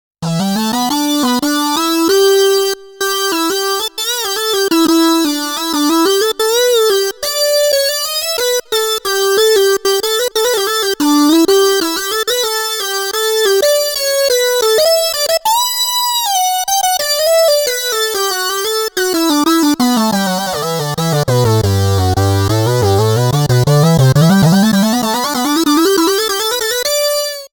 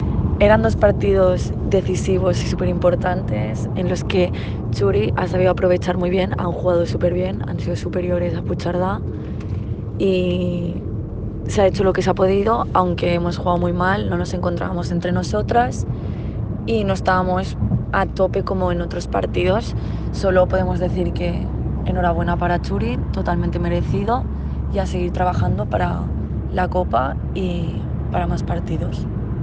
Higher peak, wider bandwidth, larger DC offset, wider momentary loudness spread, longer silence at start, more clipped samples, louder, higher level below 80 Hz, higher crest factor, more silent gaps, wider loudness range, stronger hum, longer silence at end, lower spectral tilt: about the same, -2 dBFS vs -2 dBFS; first, over 20 kHz vs 9.2 kHz; neither; second, 5 LU vs 8 LU; first, 0.2 s vs 0 s; neither; first, -13 LUFS vs -20 LUFS; second, -46 dBFS vs -30 dBFS; second, 12 dB vs 18 dB; neither; about the same, 2 LU vs 3 LU; neither; about the same, 0.1 s vs 0 s; second, -4 dB/octave vs -7.5 dB/octave